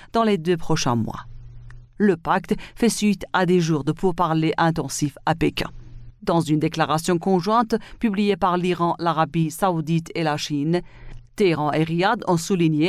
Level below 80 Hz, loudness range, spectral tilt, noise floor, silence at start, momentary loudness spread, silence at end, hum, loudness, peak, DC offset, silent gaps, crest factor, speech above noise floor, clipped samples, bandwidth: -46 dBFS; 2 LU; -5.5 dB/octave; -41 dBFS; 0 s; 5 LU; 0 s; none; -22 LUFS; -6 dBFS; under 0.1%; none; 16 dB; 20 dB; under 0.1%; 15 kHz